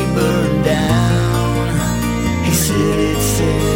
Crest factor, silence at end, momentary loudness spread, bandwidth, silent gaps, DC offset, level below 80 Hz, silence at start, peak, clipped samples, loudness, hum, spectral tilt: 12 dB; 0 s; 3 LU; 17 kHz; none; under 0.1%; -26 dBFS; 0 s; -2 dBFS; under 0.1%; -16 LUFS; none; -5.5 dB/octave